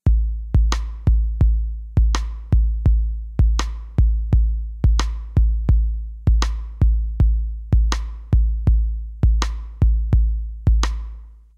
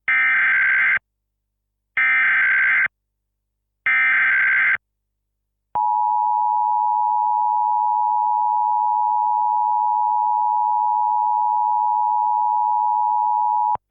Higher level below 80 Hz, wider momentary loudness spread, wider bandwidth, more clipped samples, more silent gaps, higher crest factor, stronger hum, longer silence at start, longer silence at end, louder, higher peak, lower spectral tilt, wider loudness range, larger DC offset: first, -18 dBFS vs -68 dBFS; about the same, 6 LU vs 4 LU; first, 7.4 kHz vs 3.7 kHz; neither; neither; first, 16 dB vs 8 dB; second, none vs 50 Hz at -75 dBFS; about the same, 0.05 s vs 0.1 s; about the same, 0.25 s vs 0.15 s; second, -21 LUFS vs -18 LUFS; first, -2 dBFS vs -12 dBFS; first, -6 dB/octave vs -4.5 dB/octave; about the same, 0 LU vs 2 LU; neither